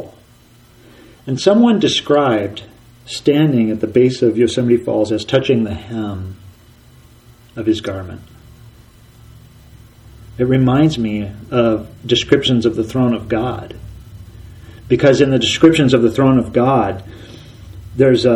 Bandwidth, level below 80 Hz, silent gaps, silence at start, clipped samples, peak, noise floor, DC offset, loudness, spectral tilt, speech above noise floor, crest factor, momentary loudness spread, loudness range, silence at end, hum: 12.5 kHz; -42 dBFS; none; 0 s; under 0.1%; 0 dBFS; -47 dBFS; under 0.1%; -15 LUFS; -6 dB/octave; 33 dB; 16 dB; 20 LU; 12 LU; 0 s; none